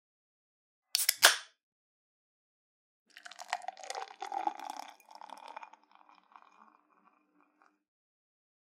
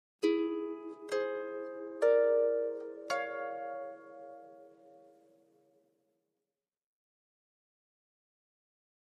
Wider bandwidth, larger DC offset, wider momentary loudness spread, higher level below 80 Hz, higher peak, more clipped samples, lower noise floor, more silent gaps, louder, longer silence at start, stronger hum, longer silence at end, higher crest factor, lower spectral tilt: first, 16 kHz vs 11 kHz; neither; first, 27 LU vs 21 LU; about the same, under -90 dBFS vs under -90 dBFS; first, -8 dBFS vs -16 dBFS; neither; second, -71 dBFS vs under -90 dBFS; first, 1.63-3.06 s vs none; first, -31 LUFS vs -34 LUFS; first, 0.95 s vs 0.2 s; neither; second, 2.95 s vs 4.15 s; first, 32 dB vs 20 dB; second, 3 dB/octave vs -3.5 dB/octave